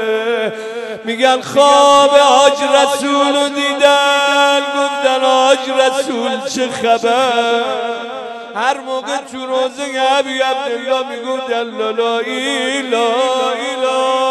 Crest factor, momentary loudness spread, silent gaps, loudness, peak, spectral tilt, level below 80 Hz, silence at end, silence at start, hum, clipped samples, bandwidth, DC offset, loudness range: 14 dB; 11 LU; none; -14 LUFS; 0 dBFS; -1.5 dB/octave; -64 dBFS; 0 s; 0 s; none; under 0.1%; 12.5 kHz; under 0.1%; 7 LU